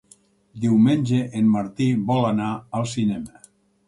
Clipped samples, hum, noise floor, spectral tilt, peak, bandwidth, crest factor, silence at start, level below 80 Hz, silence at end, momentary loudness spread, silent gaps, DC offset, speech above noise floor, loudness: under 0.1%; none; -56 dBFS; -7 dB/octave; -8 dBFS; 11.5 kHz; 14 dB; 0.55 s; -58 dBFS; 0.6 s; 9 LU; none; under 0.1%; 35 dB; -22 LUFS